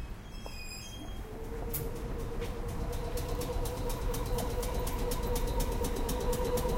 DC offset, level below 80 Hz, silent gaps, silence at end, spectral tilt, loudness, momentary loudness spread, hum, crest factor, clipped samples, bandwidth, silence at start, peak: under 0.1%; -36 dBFS; none; 0 s; -5 dB/octave; -37 LUFS; 10 LU; none; 16 dB; under 0.1%; 17 kHz; 0 s; -18 dBFS